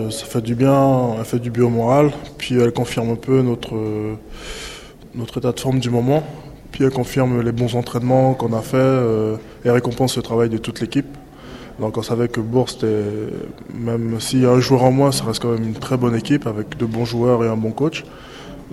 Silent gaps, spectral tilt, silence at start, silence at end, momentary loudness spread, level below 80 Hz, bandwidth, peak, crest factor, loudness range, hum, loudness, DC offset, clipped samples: none; -6.5 dB/octave; 0 s; 0 s; 16 LU; -44 dBFS; 15 kHz; 0 dBFS; 18 dB; 4 LU; none; -19 LUFS; under 0.1%; under 0.1%